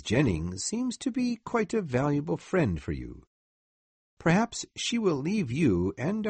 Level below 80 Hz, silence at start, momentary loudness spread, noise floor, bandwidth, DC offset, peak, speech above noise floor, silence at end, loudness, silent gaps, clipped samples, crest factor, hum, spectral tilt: -50 dBFS; 0 s; 6 LU; under -90 dBFS; 8.8 kHz; under 0.1%; -10 dBFS; over 62 dB; 0 s; -29 LUFS; 3.27-4.17 s; under 0.1%; 18 dB; none; -5.5 dB/octave